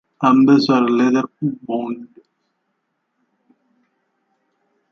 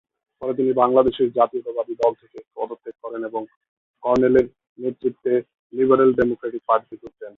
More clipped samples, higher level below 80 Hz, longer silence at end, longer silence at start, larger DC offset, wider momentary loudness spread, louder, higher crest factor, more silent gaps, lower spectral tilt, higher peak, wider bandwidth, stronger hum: neither; second, -70 dBFS vs -54 dBFS; first, 2.85 s vs 0.1 s; second, 0.2 s vs 0.4 s; neither; second, 13 LU vs 17 LU; first, -16 LUFS vs -21 LUFS; about the same, 18 dB vs 20 dB; second, none vs 3.56-3.61 s, 3.68-3.94 s, 4.69-4.76 s, 5.59-5.70 s; about the same, -7 dB/octave vs -8 dB/octave; about the same, -2 dBFS vs -2 dBFS; about the same, 6.8 kHz vs 6.8 kHz; neither